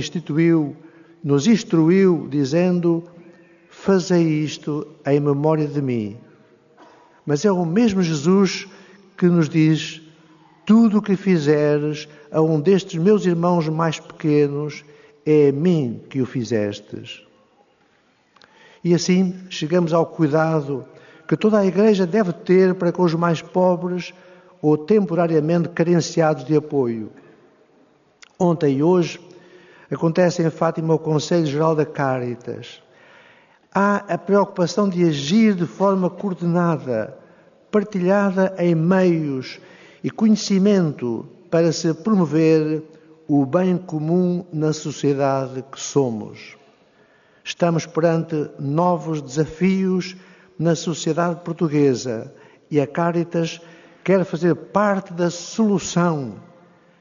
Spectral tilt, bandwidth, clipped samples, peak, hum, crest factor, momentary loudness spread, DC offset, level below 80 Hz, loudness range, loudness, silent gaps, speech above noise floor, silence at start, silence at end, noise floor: -6.5 dB/octave; 7.4 kHz; under 0.1%; -4 dBFS; none; 16 dB; 12 LU; under 0.1%; -64 dBFS; 4 LU; -19 LUFS; none; 41 dB; 0 s; 0.6 s; -60 dBFS